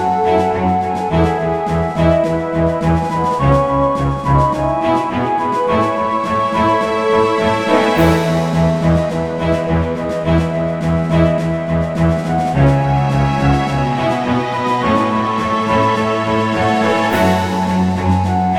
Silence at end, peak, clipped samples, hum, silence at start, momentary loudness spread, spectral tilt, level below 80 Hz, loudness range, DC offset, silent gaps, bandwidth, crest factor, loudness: 0 s; 0 dBFS; under 0.1%; none; 0 s; 4 LU; -7 dB/octave; -30 dBFS; 1 LU; 0.2%; none; 16 kHz; 14 dB; -15 LUFS